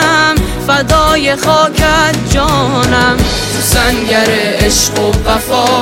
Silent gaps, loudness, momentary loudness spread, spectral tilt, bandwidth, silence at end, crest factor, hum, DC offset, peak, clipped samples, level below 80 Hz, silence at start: none; -10 LUFS; 3 LU; -3.5 dB/octave; 17 kHz; 0 s; 10 dB; none; under 0.1%; 0 dBFS; under 0.1%; -20 dBFS; 0 s